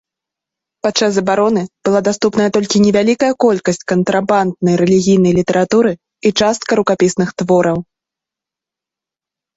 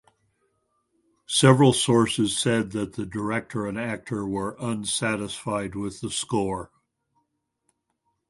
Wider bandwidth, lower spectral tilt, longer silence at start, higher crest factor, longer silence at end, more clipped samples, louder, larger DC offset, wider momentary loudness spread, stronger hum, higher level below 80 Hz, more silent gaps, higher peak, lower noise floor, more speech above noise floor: second, 8 kHz vs 11.5 kHz; about the same, -5.5 dB/octave vs -4.5 dB/octave; second, 0.85 s vs 1.3 s; second, 14 dB vs 24 dB; about the same, 1.75 s vs 1.65 s; neither; first, -14 LUFS vs -24 LUFS; neither; second, 6 LU vs 12 LU; neither; first, -50 dBFS vs -56 dBFS; neither; about the same, 0 dBFS vs -2 dBFS; first, -87 dBFS vs -76 dBFS; first, 74 dB vs 52 dB